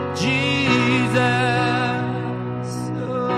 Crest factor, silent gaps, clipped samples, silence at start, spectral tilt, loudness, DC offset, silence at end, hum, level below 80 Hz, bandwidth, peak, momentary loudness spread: 16 dB; none; under 0.1%; 0 s; -5.5 dB/octave; -20 LUFS; under 0.1%; 0 s; none; -54 dBFS; 12.5 kHz; -6 dBFS; 9 LU